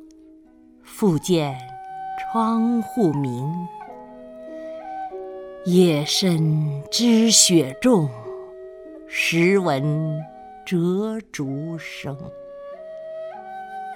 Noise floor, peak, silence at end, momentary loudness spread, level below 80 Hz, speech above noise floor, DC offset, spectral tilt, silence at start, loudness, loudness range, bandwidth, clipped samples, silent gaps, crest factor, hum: -50 dBFS; -2 dBFS; 0 s; 21 LU; -60 dBFS; 30 dB; under 0.1%; -4.5 dB/octave; 0 s; -20 LUFS; 9 LU; 17.5 kHz; under 0.1%; none; 22 dB; none